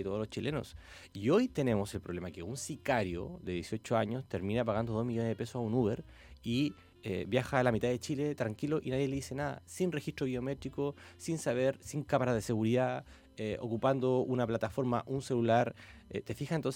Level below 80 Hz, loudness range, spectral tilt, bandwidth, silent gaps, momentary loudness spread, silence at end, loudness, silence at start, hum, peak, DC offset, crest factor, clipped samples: -58 dBFS; 3 LU; -6.5 dB/octave; 16.5 kHz; none; 11 LU; 0 s; -34 LUFS; 0 s; none; -12 dBFS; under 0.1%; 20 dB; under 0.1%